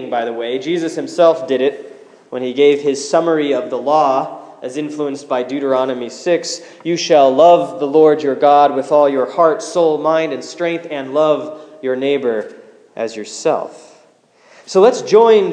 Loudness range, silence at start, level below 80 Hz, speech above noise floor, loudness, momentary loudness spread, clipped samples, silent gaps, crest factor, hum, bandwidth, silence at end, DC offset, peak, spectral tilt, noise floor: 7 LU; 0 s; -72 dBFS; 36 dB; -15 LUFS; 14 LU; under 0.1%; none; 14 dB; none; 10 kHz; 0 s; under 0.1%; 0 dBFS; -4.5 dB/octave; -51 dBFS